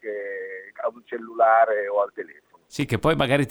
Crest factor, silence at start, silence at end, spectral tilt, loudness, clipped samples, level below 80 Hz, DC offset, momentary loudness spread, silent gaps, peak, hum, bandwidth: 18 dB; 0.05 s; 0 s; -6 dB/octave; -23 LUFS; under 0.1%; -50 dBFS; under 0.1%; 18 LU; none; -6 dBFS; none; 17 kHz